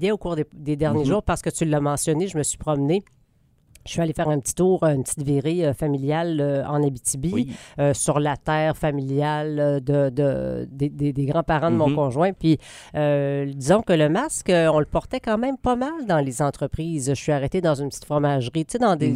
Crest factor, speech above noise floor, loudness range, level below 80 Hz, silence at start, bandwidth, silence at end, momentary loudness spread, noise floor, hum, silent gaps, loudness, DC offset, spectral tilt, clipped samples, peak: 18 dB; 38 dB; 3 LU; -44 dBFS; 0 s; 15.5 kHz; 0 s; 6 LU; -60 dBFS; none; none; -22 LUFS; under 0.1%; -6 dB/octave; under 0.1%; -4 dBFS